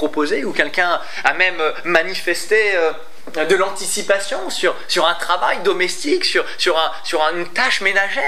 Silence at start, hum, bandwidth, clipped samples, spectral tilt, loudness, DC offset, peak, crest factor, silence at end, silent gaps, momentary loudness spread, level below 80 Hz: 0 s; none; 15.5 kHz; under 0.1%; -1.5 dB/octave; -17 LUFS; 5%; 0 dBFS; 18 dB; 0 s; none; 5 LU; -66 dBFS